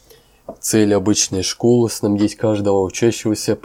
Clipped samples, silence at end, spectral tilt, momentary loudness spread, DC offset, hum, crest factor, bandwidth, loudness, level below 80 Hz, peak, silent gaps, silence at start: under 0.1%; 0.05 s; -4.5 dB/octave; 4 LU; under 0.1%; none; 14 dB; 17 kHz; -17 LUFS; -52 dBFS; -2 dBFS; none; 0.5 s